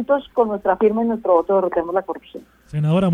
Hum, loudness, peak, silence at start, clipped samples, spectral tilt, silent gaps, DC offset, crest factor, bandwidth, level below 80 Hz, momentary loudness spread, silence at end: none; -19 LUFS; -2 dBFS; 0 s; under 0.1%; -9 dB/octave; none; under 0.1%; 16 dB; 9.8 kHz; -52 dBFS; 13 LU; 0 s